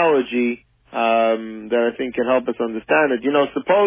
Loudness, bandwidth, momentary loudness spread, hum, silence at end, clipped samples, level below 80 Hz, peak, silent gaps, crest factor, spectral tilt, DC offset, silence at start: -20 LUFS; 3.7 kHz; 8 LU; none; 0 s; under 0.1%; -60 dBFS; -4 dBFS; none; 14 dB; -9 dB/octave; under 0.1%; 0 s